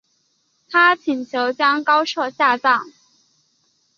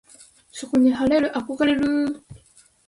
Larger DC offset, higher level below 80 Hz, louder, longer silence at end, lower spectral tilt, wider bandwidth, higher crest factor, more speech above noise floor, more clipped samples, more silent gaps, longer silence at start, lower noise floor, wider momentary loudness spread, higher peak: neither; second, -76 dBFS vs -54 dBFS; first, -18 LUFS vs -21 LUFS; first, 1.1 s vs 0.55 s; second, -2.5 dB/octave vs -5 dB/octave; second, 7.2 kHz vs 11.5 kHz; about the same, 18 dB vs 14 dB; first, 48 dB vs 34 dB; neither; neither; first, 0.7 s vs 0.55 s; first, -65 dBFS vs -55 dBFS; second, 8 LU vs 19 LU; first, -2 dBFS vs -10 dBFS